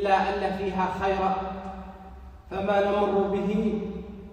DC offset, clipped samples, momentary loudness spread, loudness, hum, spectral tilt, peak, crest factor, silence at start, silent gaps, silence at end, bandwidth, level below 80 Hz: under 0.1%; under 0.1%; 18 LU; -27 LUFS; none; -7 dB/octave; -10 dBFS; 18 dB; 0 s; none; 0 s; 9.8 kHz; -46 dBFS